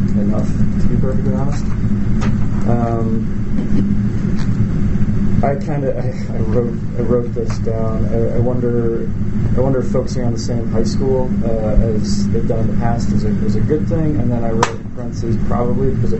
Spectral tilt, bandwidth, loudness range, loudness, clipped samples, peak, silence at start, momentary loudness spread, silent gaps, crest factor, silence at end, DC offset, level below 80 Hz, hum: -8 dB/octave; 8.2 kHz; 1 LU; -18 LUFS; under 0.1%; 0 dBFS; 0 s; 4 LU; none; 14 dB; 0 s; under 0.1%; -22 dBFS; none